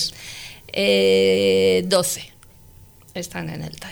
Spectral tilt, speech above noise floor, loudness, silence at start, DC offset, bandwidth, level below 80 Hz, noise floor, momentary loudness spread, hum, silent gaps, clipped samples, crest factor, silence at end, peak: -3.5 dB/octave; 28 dB; -19 LUFS; 0 s; under 0.1%; over 20 kHz; -54 dBFS; -47 dBFS; 18 LU; none; none; under 0.1%; 14 dB; 0 s; -6 dBFS